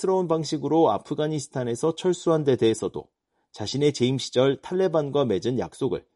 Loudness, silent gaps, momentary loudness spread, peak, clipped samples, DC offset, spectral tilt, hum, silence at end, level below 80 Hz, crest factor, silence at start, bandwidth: -24 LUFS; none; 8 LU; -8 dBFS; under 0.1%; under 0.1%; -6 dB/octave; none; 0.15 s; -62 dBFS; 16 dB; 0 s; 11.5 kHz